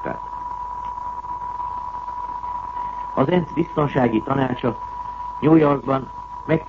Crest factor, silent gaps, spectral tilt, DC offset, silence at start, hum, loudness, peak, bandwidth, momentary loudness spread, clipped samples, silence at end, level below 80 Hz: 18 dB; none; -9 dB/octave; under 0.1%; 0 s; none; -23 LUFS; -4 dBFS; 7 kHz; 13 LU; under 0.1%; 0 s; -46 dBFS